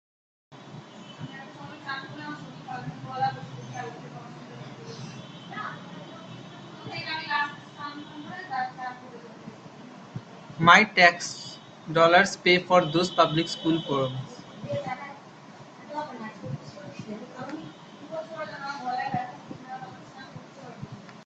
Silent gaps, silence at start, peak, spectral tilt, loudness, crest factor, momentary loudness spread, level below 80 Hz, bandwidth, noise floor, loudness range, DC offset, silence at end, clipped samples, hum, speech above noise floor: none; 0.5 s; 0 dBFS; -4.5 dB/octave; -25 LUFS; 28 dB; 24 LU; -68 dBFS; 9 kHz; -47 dBFS; 18 LU; under 0.1%; 0 s; under 0.1%; none; 25 dB